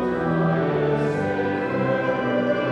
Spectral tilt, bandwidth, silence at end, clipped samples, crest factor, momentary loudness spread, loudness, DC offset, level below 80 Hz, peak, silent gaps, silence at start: -8 dB/octave; 9 kHz; 0 s; under 0.1%; 12 dB; 2 LU; -22 LUFS; under 0.1%; -50 dBFS; -10 dBFS; none; 0 s